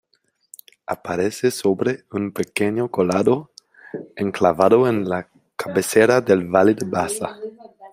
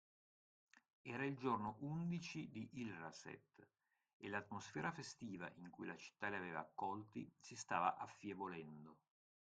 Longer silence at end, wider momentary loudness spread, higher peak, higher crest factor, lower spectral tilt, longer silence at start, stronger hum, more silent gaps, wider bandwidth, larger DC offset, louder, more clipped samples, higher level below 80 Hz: second, 0.05 s vs 0.5 s; first, 17 LU vs 13 LU; first, -2 dBFS vs -24 dBFS; about the same, 20 dB vs 24 dB; about the same, -5.5 dB/octave vs -5.5 dB/octave; first, 0.9 s vs 0.75 s; neither; second, none vs 0.93-1.04 s, 4.13-4.20 s; first, 16 kHz vs 9 kHz; neither; first, -20 LUFS vs -48 LUFS; neither; first, -62 dBFS vs -84 dBFS